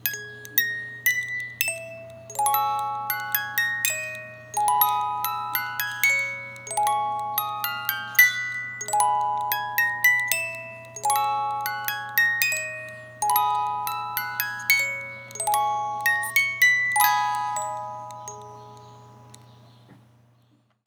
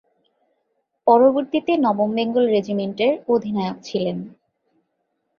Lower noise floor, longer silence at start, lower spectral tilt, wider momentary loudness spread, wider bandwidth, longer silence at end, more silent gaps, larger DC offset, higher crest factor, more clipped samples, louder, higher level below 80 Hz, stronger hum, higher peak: second, -63 dBFS vs -73 dBFS; second, 0.05 s vs 1.05 s; second, 0 dB/octave vs -7 dB/octave; first, 15 LU vs 11 LU; first, over 20 kHz vs 7 kHz; second, 0.9 s vs 1.1 s; neither; neither; first, 26 dB vs 18 dB; neither; second, -23 LUFS vs -20 LUFS; second, -76 dBFS vs -64 dBFS; neither; about the same, 0 dBFS vs -2 dBFS